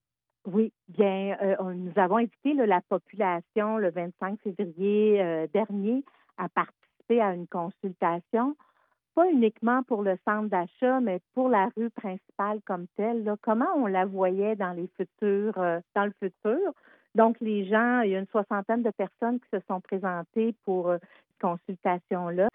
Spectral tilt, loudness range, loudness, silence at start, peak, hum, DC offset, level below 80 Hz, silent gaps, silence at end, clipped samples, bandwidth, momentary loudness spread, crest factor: -10.5 dB/octave; 3 LU; -28 LUFS; 0.45 s; -8 dBFS; none; under 0.1%; -80 dBFS; none; 0.05 s; under 0.1%; 3.8 kHz; 9 LU; 20 dB